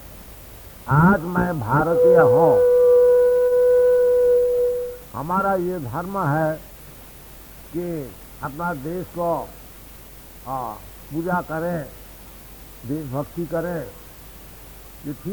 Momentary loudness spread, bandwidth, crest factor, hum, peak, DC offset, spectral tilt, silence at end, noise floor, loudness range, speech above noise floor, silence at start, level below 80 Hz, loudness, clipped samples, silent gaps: 26 LU; over 20 kHz; 18 dB; none; -4 dBFS; under 0.1%; -7.5 dB/octave; 0 s; -42 dBFS; 14 LU; 21 dB; 0 s; -46 dBFS; -20 LUFS; under 0.1%; none